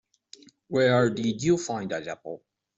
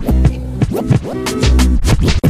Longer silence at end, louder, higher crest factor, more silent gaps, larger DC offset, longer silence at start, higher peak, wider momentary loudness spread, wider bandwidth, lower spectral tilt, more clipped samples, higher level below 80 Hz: first, 0.4 s vs 0 s; second, -26 LUFS vs -15 LUFS; first, 18 dB vs 12 dB; neither; neither; first, 0.7 s vs 0 s; second, -10 dBFS vs 0 dBFS; first, 17 LU vs 6 LU; second, 8.2 kHz vs 15 kHz; about the same, -5.5 dB/octave vs -6 dB/octave; neither; second, -62 dBFS vs -16 dBFS